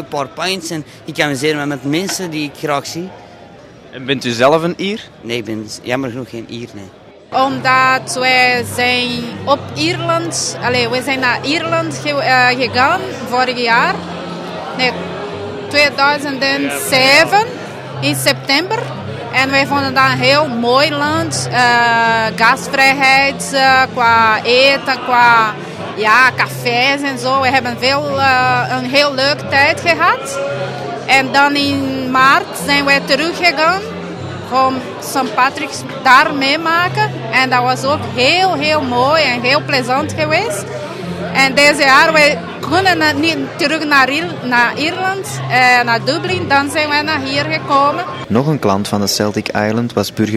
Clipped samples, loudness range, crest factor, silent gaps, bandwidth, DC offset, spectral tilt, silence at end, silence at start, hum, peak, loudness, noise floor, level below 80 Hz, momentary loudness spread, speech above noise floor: 0.1%; 7 LU; 14 dB; none; 16.5 kHz; under 0.1%; -3.5 dB/octave; 0 s; 0 s; none; 0 dBFS; -13 LUFS; -38 dBFS; -54 dBFS; 12 LU; 24 dB